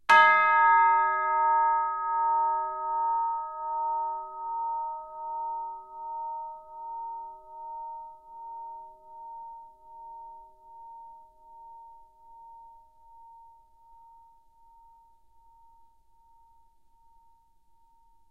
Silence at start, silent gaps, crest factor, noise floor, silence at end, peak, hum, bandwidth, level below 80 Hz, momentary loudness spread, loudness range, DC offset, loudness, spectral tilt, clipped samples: 0.1 s; none; 22 dB; -65 dBFS; 4.9 s; -8 dBFS; none; 10 kHz; -70 dBFS; 28 LU; 26 LU; under 0.1%; -26 LUFS; -1.5 dB/octave; under 0.1%